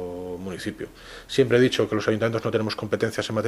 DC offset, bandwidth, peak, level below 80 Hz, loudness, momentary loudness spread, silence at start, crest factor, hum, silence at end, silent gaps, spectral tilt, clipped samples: under 0.1%; 14.5 kHz; -6 dBFS; -54 dBFS; -24 LUFS; 14 LU; 0 s; 18 dB; none; 0 s; none; -5.5 dB/octave; under 0.1%